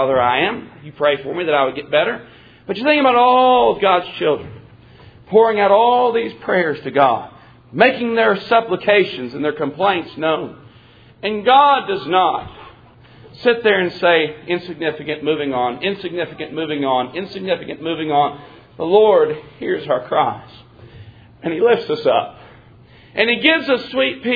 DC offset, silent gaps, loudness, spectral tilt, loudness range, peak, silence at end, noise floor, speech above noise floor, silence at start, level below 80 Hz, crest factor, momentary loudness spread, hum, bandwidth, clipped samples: under 0.1%; none; -17 LUFS; -7.5 dB/octave; 5 LU; 0 dBFS; 0 s; -46 dBFS; 29 dB; 0 s; -56 dBFS; 18 dB; 13 LU; none; 5 kHz; under 0.1%